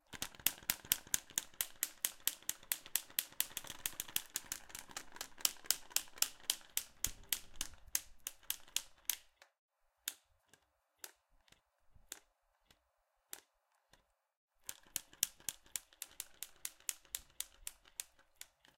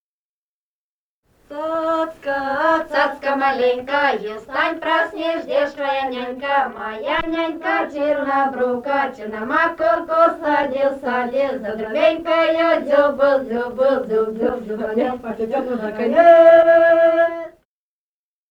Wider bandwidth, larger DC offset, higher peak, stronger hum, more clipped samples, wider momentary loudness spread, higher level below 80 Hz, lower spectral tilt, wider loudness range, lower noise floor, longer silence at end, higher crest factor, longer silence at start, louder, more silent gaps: first, 17 kHz vs 7.6 kHz; neither; second, -6 dBFS vs 0 dBFS; neither; neither; first, 18 LU vs 11 LU; second, -66 dBFS vs -54 dBFS; second, 1.5 dB/octave vs -5.5 dB/octave; first, 19 LU vs 6 LU; second, -82 dBFS vs under -90 dBFS; second, 0.3 s vs 1 s; first, 38 dB vs 18 dB; second, 0.1 s vs 1.5 s; second, -41 LUFS vs -18 LUFS; first, 9.59-9.69 s, 14.37-14.48 s vs none